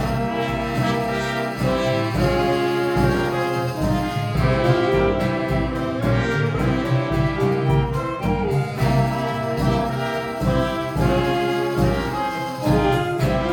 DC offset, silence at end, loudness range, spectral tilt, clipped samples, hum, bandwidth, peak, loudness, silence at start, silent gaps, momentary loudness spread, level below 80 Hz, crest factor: under 0.1%; 0 s; 1 LU; -7 dB/octave; under 0.1%; none; 18.5 kHz; -4 dBFS; -21 LUFS; 0 s; none; 4 LU; -34 dBFS; 16 dB